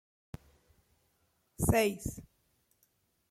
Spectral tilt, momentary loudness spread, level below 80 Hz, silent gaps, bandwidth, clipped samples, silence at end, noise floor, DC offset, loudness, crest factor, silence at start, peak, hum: -5 dB/octave; 24 LU; -52 dBFS; none; 16.5 kHz; under 0.1%; 1.1 s; -75 dBFS; under 0.1%; -32 LUFS; 22 dB; 1.6 s; -14 dBFS; none